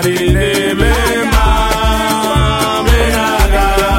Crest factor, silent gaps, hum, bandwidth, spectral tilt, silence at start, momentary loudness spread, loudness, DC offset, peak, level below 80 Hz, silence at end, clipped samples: 12 dB; none; none; 17 kHz; -4.5 dB/octave; 0 s; 1 LU; -12 LUFS; under 0.1%; 0 dBFS; -16 dBFS; 0 s; under 0.1%